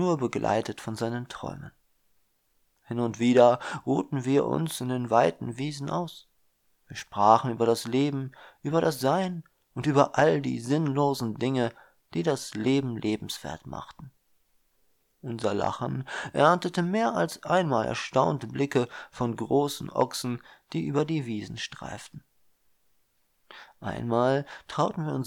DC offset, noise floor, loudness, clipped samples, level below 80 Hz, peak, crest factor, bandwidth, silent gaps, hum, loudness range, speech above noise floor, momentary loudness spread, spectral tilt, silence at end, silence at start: under 0.1%; -70 dBFS; -27 LUFS; under 0.1%; -62 dBFS; -4 dBFS; 22 dB; 17 kHz; none; none; 7 LU; 44 dB; 16 LU; -6 dB/octave; 0 s; 0 s